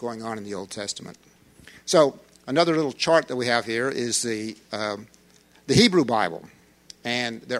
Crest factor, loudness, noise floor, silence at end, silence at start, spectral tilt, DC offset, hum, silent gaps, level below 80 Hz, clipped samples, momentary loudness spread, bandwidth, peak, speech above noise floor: 22 dB; -23 LUFS; -56 dBFS; 0 s; 0 s; -4 dB/octave; under 0.1%; none; none; -56 dBFS; under 0.1%; 17 LU; 15.5 kHz; -4 dBFS; 33 dB